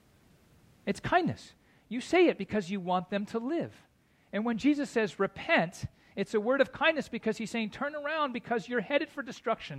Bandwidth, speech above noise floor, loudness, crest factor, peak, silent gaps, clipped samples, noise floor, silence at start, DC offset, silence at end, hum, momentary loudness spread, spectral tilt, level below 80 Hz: 13.5 kHz; 32 dB; -31 LUFS; 20 dB; -12 dBFS; none; under 0.1%; -63 dBFS; 0.85 s; under 0.1%; 0 s; none; 11 LU; -5.5 dB/octave; -64 dBFS